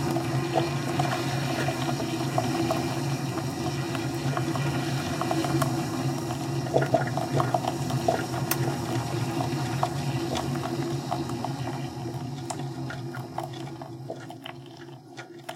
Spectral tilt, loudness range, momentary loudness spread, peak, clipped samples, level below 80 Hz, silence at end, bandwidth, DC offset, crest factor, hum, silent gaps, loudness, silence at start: -5.5 dB/octave; 7 LU; 12 LU; -6 dBFS; under 0.1%; -56 dBFS; 0 s; 16.5 kHz; under 0.1%; 22 dB; none; none; -29 LUFS; 0 s